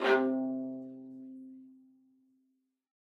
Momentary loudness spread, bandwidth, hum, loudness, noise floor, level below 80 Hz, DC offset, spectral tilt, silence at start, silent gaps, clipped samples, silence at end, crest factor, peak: 23 LU; 7.4 kHz; none; -33 LUFS; -78 dBFS; under -90 dBFS; under 0.1%; -5.5 dB/octave; 0 s; none; under 0.1%; 1.4 s; 22 dB; -14 dBFS